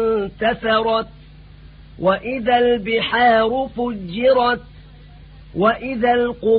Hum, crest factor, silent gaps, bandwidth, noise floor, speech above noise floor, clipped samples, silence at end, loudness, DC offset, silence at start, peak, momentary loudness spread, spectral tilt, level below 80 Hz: none; 16 dB; none; 5 kHz; -42 dBFS; 24 dB; under 0.1%; 0 s; -18 LUFS; under 0.1%; 0 s; -2 dBFS; 9 LU; -10 dB/octave; -44 dBFS